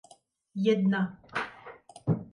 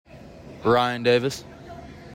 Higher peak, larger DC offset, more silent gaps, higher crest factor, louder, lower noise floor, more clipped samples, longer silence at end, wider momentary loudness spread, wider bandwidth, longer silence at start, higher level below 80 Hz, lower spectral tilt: second, -14 dBFS vs -8 dBFS; neither; neither; about the same, 16 dB vs 18 dB; second, -30 LUFS vs -22 LUFS; first, -60 dBFS vs -43 dBFS; neither; about the same, 0.1 s vs 0 s; second, 18 LU vs 22 LU; second, 10.5 kHz vs 16 kHz; first, 0.55 s vs 0.15 s; second, -66 dBFS vs -54 dBFS; first, -7.5 dB/octave vs -5 dB/octave